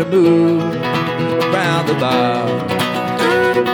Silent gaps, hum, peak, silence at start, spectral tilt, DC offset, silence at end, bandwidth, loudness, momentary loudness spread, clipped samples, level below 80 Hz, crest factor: none; none; -4 dBFS; 0 s; -6 dB/octave; under 0.1%; 0 s; 19 kHz; -15 LUFS; 6 LU; under 0.1%; -56 dBFS; 12 dB